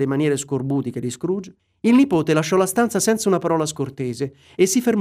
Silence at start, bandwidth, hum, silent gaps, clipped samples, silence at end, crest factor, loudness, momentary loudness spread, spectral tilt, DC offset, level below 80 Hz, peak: 0 s; 15.5 kHz; none; none; under 0.1%; 0 s; 14 dB; -20 LUFS; 10 LU; -5 dB/octave; under 0.1%; -60 dBFS; -4 dBFS